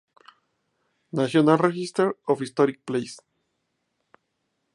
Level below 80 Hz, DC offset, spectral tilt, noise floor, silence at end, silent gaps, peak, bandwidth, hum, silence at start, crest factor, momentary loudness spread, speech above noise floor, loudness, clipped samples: -74 dBFS; under 0.1%; -6.5 dB/octave; -76 dBFS; 1.6 s; none; -4 dBFS; 11.5 kHz; none; 1.15 s; 22 dB; 11 LU; 54 dB; -23 LUFS; under 0.1%